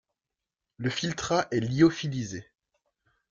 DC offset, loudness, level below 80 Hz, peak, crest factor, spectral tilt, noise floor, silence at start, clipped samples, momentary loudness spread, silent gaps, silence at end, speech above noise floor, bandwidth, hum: under 0.1%; -28 LUFS; -60 dBFS; -10 dBFS; 20 dB; -5.5 dB/octave; -89 dBFS; 0.8 s; under 0.1%; 12 LU; none; 0.9 s; 62 dB; 7.6 kHz; none